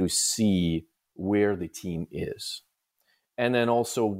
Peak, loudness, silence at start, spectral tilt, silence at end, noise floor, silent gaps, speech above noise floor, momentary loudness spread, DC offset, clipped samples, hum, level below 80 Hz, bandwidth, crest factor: -10 dBFS; -27 LUFS; 0 s; -4.5 dB/octave; 0 s; -72 dBFS; none; 46 dB; 12 LU; under 0.1%; under 0.1%; none; -54 dBFS; 16 kHz; 16 dB